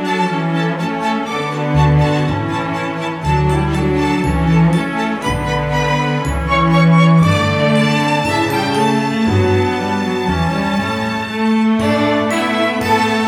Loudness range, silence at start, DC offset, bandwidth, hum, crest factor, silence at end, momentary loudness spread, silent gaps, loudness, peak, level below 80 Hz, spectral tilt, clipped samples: 3 LU; 0 s; under 0.1%; 17 kHz; none; 14 dB; 0 s; 7 LU; none; -15 LUFS; -2 dBFS; -30 dBFS; -6.5 dB/octave; under 0.1%